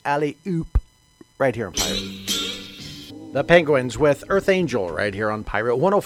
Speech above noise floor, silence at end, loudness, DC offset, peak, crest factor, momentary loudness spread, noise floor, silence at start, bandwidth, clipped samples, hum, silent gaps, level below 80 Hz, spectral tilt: 32 dB; 0 s; -22 LUFS; under 0.1%; 0 dBFS; 22 dB; 12 LU; -52 dBFS; 0.05 s; 16.5 kHz; under 0.1%; none; none; -36 dBFS; -4.5 dB/octave